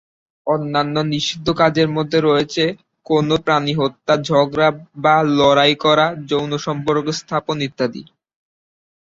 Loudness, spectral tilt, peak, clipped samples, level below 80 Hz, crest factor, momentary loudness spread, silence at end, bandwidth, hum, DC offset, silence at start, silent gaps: -17 LUFS; -5.5 dB/octave; -2 dBFS; under 0.1%; -52 dBFS; 16 dB; 9 LU; 1.15 s; 7.8 kHz; none; under 0.1%; 0.45 s; none